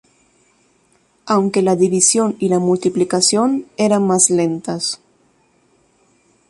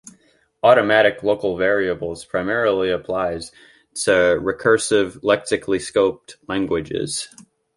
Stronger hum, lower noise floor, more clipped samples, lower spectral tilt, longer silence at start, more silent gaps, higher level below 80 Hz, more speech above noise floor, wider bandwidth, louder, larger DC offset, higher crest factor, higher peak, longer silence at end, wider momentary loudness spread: neither; about the same, -58 dBFS vs -59 dBFS; neither; about the same, -4 dB/octave vs -4 dB/octave; first, 1.25 s vs 0.05 s; neither; second, -62 dBFS vs -50 dBFS; about the same, 43 dB vs 40 dB; about the same, 11.5 kHz vs 11.5 kHz; first, -15 LUFS vs -19 LUFS; neither; about the same, 18 dB vs 18 dB; about the same, 0 dBFS vs -2 dBFS; first, 1.55 s vs 0.35 s; second, 9 LU vs 12 LU